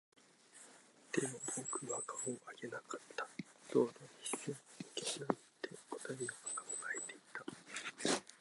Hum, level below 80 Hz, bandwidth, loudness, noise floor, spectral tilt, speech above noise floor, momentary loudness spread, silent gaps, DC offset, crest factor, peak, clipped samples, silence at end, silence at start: none; under -90 dBFS; 12 kHz; -43 LUFS; -63 dBFS; -3 dB/octave; 21 dB; 12 LU; none; under 0.1%; 28 dB; -16 dBFS; under 0.1%; 0.05 s; 0.55 s